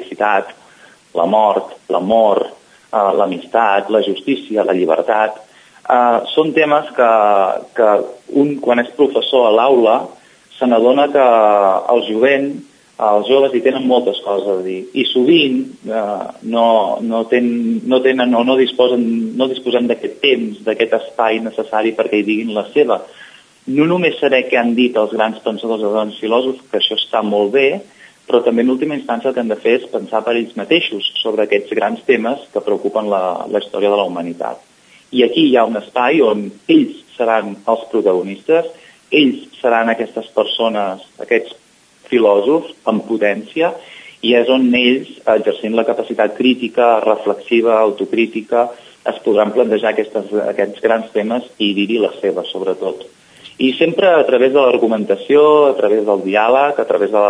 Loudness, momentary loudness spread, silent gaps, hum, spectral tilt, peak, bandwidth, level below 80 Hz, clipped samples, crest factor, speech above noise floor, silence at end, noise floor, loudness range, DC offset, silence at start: -15 LUFS; 8 LU; none; none; -6 dB/octave; 0 dBFS; 10.5 kHz; -68 dBFS; under 0.1%; 14 dB; 32 dB; 0 s; -46 dBFS; 4 LU; under 0.1%; 0 s